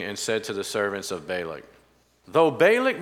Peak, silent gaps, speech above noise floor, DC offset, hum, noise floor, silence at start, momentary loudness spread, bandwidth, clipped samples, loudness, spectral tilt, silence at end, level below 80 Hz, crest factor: -6 dBFS; none; 37 dB; under 0.1%; none; -61 dBFS; 0 s; 13 LU; 16 kHz; under 0.1%; -24 LUFS; -3.5 dB/octave; 0 s; -66 dBFS; 20 dB